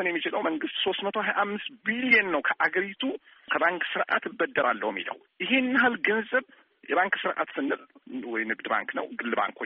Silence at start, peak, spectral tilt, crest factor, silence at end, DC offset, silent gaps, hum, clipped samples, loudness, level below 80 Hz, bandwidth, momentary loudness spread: 0 s; -8 dBFS; -0.5 dB/octave; 20 dB; 0 s; under 0.1%; none; none; under 0.1%; -27 LUFS; -74 dBFS; 5 kHz; 10 LU